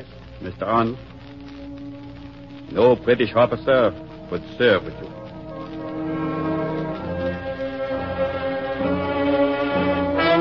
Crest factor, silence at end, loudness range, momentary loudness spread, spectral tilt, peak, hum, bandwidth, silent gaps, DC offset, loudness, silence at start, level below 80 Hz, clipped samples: 18 dB; 0 s; 6 LU; 19 LU; -8.5 dB/octave; -4 dBFS; none; 6 kHz; none; 0.2%; -22 LUFS; 0 s; -46 dBFS; under 0.1%